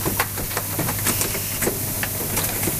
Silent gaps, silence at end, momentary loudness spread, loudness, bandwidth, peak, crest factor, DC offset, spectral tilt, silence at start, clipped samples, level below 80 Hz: none; 0 s; 3 LU; -22 LUFS; 16.5 kHz; -2 dBFS; 20 dB; under 0.1%; -3 dB/octave; 0 s; under 0.1%; -40 dBFS